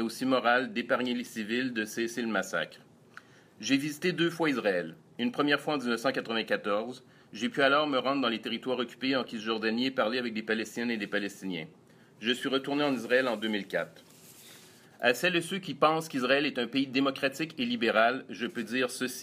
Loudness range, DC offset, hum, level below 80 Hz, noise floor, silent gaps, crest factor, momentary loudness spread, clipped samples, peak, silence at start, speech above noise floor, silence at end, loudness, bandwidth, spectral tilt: 3 LU; under 0.1%; none; -80 dBFS; -54 dBFS; none; 22 dB; 9 LU; under 0.1%; -8 dBFS; 0 s; 25 dB; 0 s; -30 LUFS; 15.5 kHz; -4 dB/octave